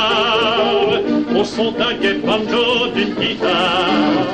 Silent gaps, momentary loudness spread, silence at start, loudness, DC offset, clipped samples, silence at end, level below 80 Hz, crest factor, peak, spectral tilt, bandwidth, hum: none; 4 LU; 0 s; -16 LUFS; under 0.1%; under 0.1%; 0 s; -46 dBFS; 10 dB; -6 dBFS; -4.5 dB/octave; 9.6 kHz; none